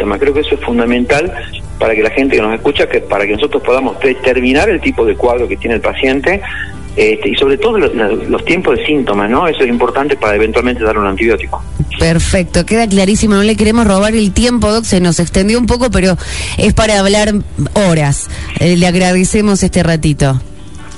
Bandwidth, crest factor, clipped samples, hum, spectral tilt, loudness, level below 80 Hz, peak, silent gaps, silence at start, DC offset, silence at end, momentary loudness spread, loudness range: 11.5 kHz; 12 dB; under 0.1%; none; -5 dB/octave; -11 LUFS; -24 dBFS; 0 dBFS; none; 0 s; 4%; 0 s; 5 LU; 2 LU